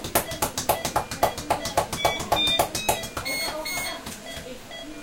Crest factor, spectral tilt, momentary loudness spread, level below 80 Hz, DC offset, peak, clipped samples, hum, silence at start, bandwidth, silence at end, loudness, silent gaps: 24 dB; -2 dB/octave; 14 LU; -46 dBFS; under 0.1%; -4 dBFS; under 0.1%; none; 0 s; 17 kHz; 0 s; -25 LUFS; none